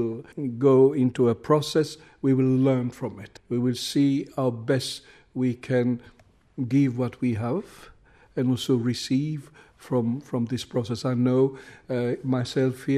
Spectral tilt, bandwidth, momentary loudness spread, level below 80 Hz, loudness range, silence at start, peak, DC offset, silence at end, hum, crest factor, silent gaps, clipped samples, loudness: -7 dB/octave; 14 kHz; 12 LU; -62 dBFS; 5 LU; 0 s; -8 dBFS; under 0.1%; 0 s; none; 16 dB; none; under 0.1%; -25 LUFS